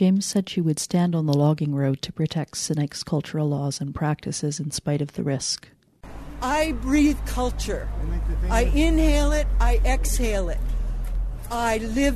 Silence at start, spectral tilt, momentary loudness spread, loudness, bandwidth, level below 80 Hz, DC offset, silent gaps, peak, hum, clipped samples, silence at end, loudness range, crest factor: 0 s; -5.5 dB/octave; 9 LU; -24 LUFS; 13.5 kHz; -26 dBFS; under 0.1%; none; -8 dBFS; none; under 0.1%; 0 s; 4 LU; 16 dB